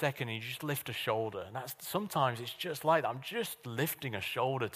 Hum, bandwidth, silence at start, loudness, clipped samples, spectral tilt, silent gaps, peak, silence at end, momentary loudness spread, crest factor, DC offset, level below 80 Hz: none; 15.5 kHz; 0 s; -35 LUFS; under 0.1%; -4.5 dB/octave; none; -14 dBFS; 0 s; 8 LU; 20 dB; under 0.1%; -74 dBFS